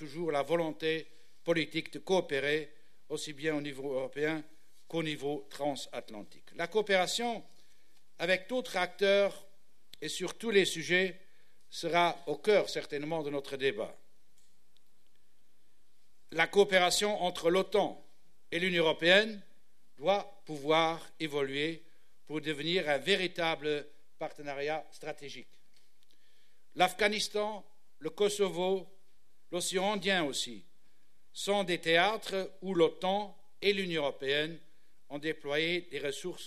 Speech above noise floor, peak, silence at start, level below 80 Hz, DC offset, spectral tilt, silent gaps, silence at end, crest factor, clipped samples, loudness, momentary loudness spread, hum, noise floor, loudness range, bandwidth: 43 dB; -10 dBFS; 0 s; -70 dBFS; 0.4%; -3.5 dB/octave; none; 0 s; 22 dB; under 0.1%; -32 LUFS; 15 LU; none; -75 dBFS; 6 LU; 14 kHz